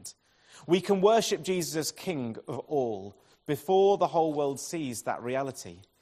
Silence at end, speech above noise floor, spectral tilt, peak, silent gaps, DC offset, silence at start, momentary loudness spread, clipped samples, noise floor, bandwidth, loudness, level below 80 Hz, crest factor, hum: 0.2 s; 28 dB; -4.5 dB/octave; -10 dBFS; none; under 0.1%; 0.05 s; 19 LU; under 0.1%; -57 dBFS; 15.5 kHz; -28 LUFS; -70 dBFS; 20 dB; none